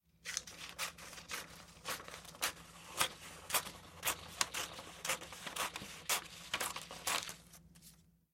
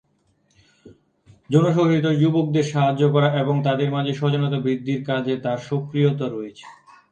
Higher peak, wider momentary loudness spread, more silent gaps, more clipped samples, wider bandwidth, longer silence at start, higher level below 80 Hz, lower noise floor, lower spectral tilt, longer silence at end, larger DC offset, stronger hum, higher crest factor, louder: second, -10 dBFS vs -2 dBFS; first, 14 LU vs 7 LU; neither; neither; first, 16.5 kHz vs 8.6 kHz; second, 0.25 s vs 0.85 s; about the same, -68 dBFS vs -64 dBFS; about the same, -64 dBFS vs -65 dBFS; second, -0.5 dB/octave vs -7.5 dB/octave; about the same, 0.3 s vs 0.4 s; neither; neither; first, 34 dB vs 18 dB; second, -40 LUFS vs -21 LUFS